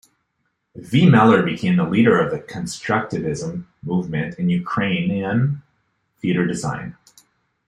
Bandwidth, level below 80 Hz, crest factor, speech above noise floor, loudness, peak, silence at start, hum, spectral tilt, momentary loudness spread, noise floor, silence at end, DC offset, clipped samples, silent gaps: 11 kHz; -54 dBFS; 18 dB; 53 dB; -19 LUFS; -2 dBFS; 0.75 s; none; -7 dB/octave; 14 LU; -72 dBFS; 0.75 s; under 0.1%; under 0.1%; none